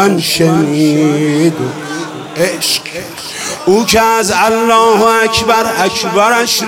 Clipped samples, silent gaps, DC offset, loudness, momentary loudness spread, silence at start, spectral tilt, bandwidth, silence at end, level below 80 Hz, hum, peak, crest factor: under 0.1%; none; under 0.1%; -11 LUFS; 12 LU; 0 s; -4 dB/octave; 17.5 kHz; 0 s; -44 dBFS; none; 0 dBFS; 12 dB